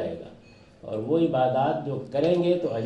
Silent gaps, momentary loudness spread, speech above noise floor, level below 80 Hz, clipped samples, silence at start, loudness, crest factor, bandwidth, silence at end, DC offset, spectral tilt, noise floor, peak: none; 17 LU; 27 dB; -62 dBFS; under 0.1%; 0 s; -25 LUFS; 14 dB; 8.4 kHz; 0 s; under 0.1%; -8.5 dB/octave; -51 dBFS; -10 dBFS